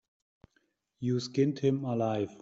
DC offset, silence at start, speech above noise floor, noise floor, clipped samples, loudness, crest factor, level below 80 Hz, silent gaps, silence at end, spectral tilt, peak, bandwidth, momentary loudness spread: under 0.1%; 1 s; 45 dB; -75 dBFS; under 0.1%; -31 LUFS; 16 dB; -70 dBFS; none; 0.05 s; -7.5 dB/octave; -16 dBFS; 7.8 kHz; 5 LU